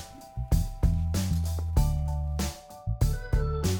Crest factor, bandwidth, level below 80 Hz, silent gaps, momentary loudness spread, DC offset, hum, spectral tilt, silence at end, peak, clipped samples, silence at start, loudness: 16 dB; 19 kHz; -30 dBFS; none; 9 LU; under 0.1%; none; -6 dB/octave; 0 s; -12 dBFS; under 0.1%; 0 s; -30 LUFS